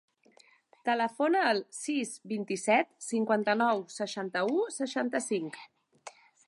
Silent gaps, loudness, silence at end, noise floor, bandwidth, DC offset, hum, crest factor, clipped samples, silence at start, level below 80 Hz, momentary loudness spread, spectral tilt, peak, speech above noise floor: none; -30 LUFS; 0.4 s; -63 dBFS; 11.5 kHz; under 0.1%; none; 18 dB; under 0.1%; 0.85 s; -84 dBFS; 13 LU; -3.5 dB/octave; -14 dBFS; 32 dB